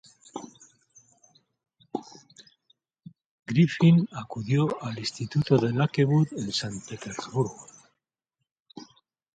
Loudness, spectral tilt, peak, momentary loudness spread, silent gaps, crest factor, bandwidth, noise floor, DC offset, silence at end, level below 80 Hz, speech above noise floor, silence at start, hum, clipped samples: -26 LUFS; -6.5 dB/octave; -8 dBFS; 24 LU; 3.26-3.38 s, 8.52-8.65 s; 20 dB; 9.2 kHz; -84 dBFS; under 0.1%; 0.5 s; -64 dBFS; 59 dB; 0.35 s; none; under 0.1%